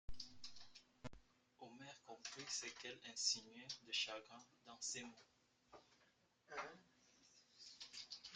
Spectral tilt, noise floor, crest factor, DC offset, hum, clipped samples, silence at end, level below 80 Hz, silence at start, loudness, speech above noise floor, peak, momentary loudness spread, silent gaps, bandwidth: -0.5 dB/octave; -78 dBFS; 26 dB; under 0.1%; none; under 0.1%; 0 s; -70 dBFS; 0.1 s; -48 LUFS; 29 dB; -26 dBFS; 24 LU; none; 11.5 kHz